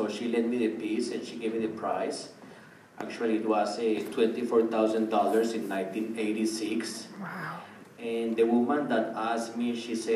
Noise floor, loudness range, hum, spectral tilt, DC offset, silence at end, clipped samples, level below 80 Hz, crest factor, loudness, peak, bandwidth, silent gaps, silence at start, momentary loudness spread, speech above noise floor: -51 dBFS; 4 LU; none; -5 dB/octave; under 0.1%; 0 s; under 0.1%; -82 dBFS; 18 dB; -29 LUFS; -12 dBFS; 14.5 kHz; none; 0 s; 14 LU; 22 dB